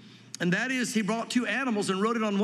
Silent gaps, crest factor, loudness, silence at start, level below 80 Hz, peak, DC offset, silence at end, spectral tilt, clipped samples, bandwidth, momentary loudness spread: none; 14 dB; -28 LUFS; 0 s; -84 dBFS; -14 dBFS; under 0.1%; 0 s; -4.5 dB/octave; under 0.1%; 13.5 kHz; 2 LU